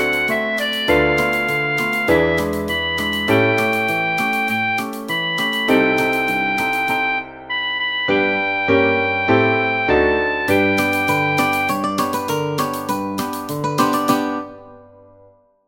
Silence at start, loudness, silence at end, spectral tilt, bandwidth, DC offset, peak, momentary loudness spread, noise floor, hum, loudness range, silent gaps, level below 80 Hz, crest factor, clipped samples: 0 s; -18 LUFS; 0.85 s; -4.5 dB/octave; 17 kHz; under 0.1%; -2 dBFS; 7 LU; -51 dBFS; none; 3 LU; none; -44 dBFS; 16 dB; under 0.1%